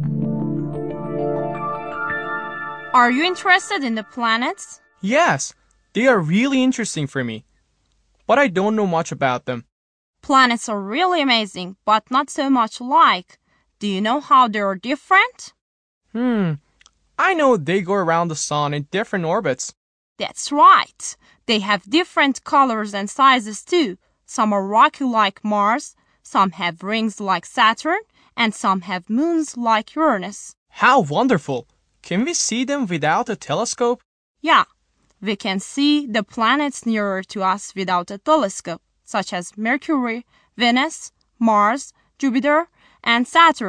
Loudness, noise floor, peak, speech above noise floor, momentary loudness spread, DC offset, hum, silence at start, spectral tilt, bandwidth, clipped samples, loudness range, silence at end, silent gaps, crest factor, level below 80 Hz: -19 LUFS; -64 dBFS; -2 dBFS; 46 dB; 13 LU; under 0.1%; none; 0 s; -4 dB/octave; 10.5 kHz; under 0.1%; 3 LU; 0 s; 9.72-10.14 s, 15.61-16.01 s, 19.77-20.16 s, 30.57-30.66 s, 34.05-34.35 s; 18 dB; -62 dBFS